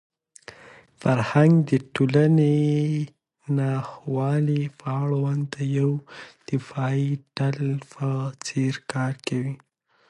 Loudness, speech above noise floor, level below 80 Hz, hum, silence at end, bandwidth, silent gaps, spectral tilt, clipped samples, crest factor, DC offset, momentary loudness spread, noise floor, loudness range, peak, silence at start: -24 LUFS; 27 dB; -64 dBFS; none; 0.55 s; 10.5 kHz; none; -7.5 dB/octave; under 0.1%; 18 dB; under 0.1%; 12 LU; -50 dBFS; 6 LU; -6 dBFS; 0.5 s